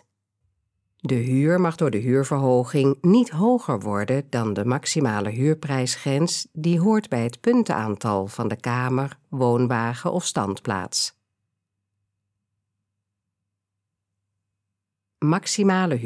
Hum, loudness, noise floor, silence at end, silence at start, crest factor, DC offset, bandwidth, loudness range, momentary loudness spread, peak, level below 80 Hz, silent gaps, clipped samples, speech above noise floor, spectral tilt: none; -22 LUFS; -83 dBFS; 0 s; 1.05 s; 16 dB; under 0.1%; 11 kHz; 9 LU; 7 LU; -8 dBFS; -70 dBFS; none; under 0.1%; 61 dB; -5.5 dB/octave